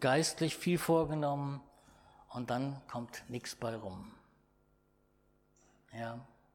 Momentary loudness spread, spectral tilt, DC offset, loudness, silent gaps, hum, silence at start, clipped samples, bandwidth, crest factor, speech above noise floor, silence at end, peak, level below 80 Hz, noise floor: 17 LU; -5 dB/octave; under 0.1%; -36 LUFS; none; none; 0 s; under 0.1%; 18.5 kHz; 22 dB; 37 dB; 0.3 s; -16 dBFS; -66 dBFS; -72 dBFS